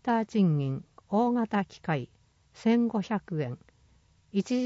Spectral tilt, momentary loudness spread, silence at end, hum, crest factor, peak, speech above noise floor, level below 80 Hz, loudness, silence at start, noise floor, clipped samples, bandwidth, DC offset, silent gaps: -7.5 dB/octave; 10 LU; 0 s; none; 14 dB; -16 dBFS; 35 dB; -66 dBFS; -29 LUFS; 0.05 s; -63 dBFS; under 0.1%; 7.8 kHz; under 0.1%; none